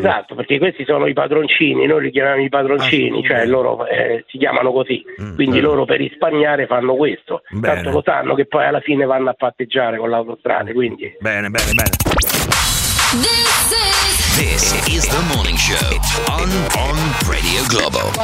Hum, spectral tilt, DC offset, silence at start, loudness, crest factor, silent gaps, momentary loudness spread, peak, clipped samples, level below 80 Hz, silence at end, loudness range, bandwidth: none; -3.5 dB/octave; under 0.1%; 0 s; -15 LUFS; 16 dB; none; 7 LU; 0 dBFS; under 0.1%; -28 dBFS; 0 s; 4 LU; 16.5 kHz